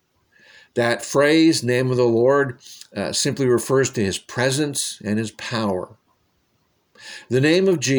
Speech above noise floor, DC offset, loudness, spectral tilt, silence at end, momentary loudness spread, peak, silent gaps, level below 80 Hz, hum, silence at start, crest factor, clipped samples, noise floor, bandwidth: 47 dB; under 0.1%; -20 LUFS; -4.5 dB/octave; 0 s; 12 LU; -4 dBFS; none; -60 dBFS; none; 0.75 s; 16 dB; under 0.1%; -66 dBFS; over 20 kHz